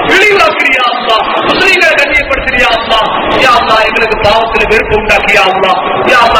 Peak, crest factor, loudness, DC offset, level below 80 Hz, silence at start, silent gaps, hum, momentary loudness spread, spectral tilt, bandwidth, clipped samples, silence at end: 0 dBFS; 8 dB; -7 LUFS; under 0.1%; -28 dBFS; 0 s; none; none; 4 LU; -3.5 dB/octave; over 20 kHz; 4%; 0 s